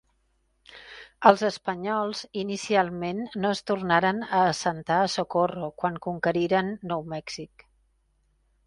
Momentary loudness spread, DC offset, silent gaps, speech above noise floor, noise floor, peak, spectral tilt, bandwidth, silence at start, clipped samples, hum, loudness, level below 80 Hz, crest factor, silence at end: 13 LU; under 0.1%; none; 44 dB; -70 dBFS; 0 dBFS; -5 dB/octave; 11.5 kHz; 0.7 s; under 0.1%; none; -26 LUFS; -62 dBFS; 26 dB; 1.2 s